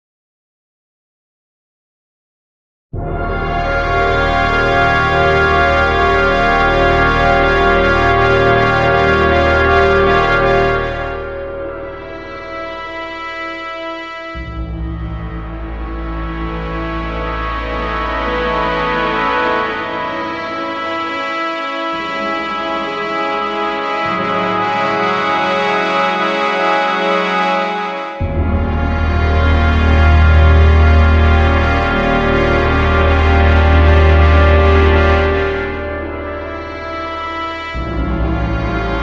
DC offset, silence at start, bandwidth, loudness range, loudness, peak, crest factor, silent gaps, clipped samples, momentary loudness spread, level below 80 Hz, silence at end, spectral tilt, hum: 0.5%; 2.95 s; 7.4 kHz; 12 LU; -14 LUFS; 0 dBFS; 14 dB; none; under 0.1%; 14 LU; -20 dBFS; 0 s; -7 dB/octave; none